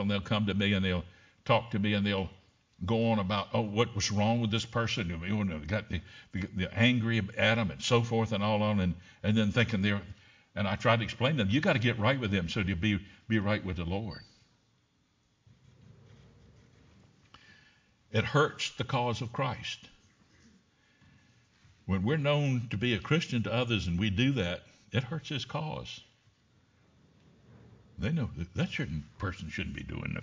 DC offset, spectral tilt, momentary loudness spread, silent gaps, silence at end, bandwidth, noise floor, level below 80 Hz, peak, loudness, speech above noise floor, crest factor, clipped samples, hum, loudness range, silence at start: under 0.1%; -6 dB/octave; 11 LU; none; 0 s; 7.6 kHz; -71 dBFS; -50 dBFS; -10 dBFS; -31 LUFS; 41 dB; 22 dB; under 0.1%; none; 9 LU; 0 s